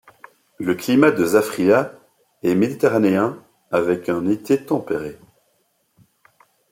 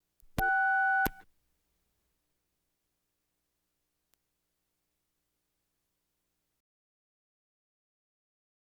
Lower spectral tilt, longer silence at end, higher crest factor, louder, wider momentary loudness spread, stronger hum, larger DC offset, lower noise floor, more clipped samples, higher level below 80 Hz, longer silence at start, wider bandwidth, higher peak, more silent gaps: first, -6 dB/octave vs -4 dB/octave; second, 1.55 s vs 7.4 s; second, 18 dB vs 26 dB; first, -19 LUFS vs -28 LUFS; first, 11 LU vs 7 LU; second, none vs 60 Hz at -90 dBFS; neither; second, -66 dBFS vs -83 dBFS; neither; about the same, -62 dBFS vs -58 dBFS; first, 0.6 s vs 0.35 s; second, 16.5 kHz vs over 20 kHz; first, -2 dBFS vs -12 dBFS; neither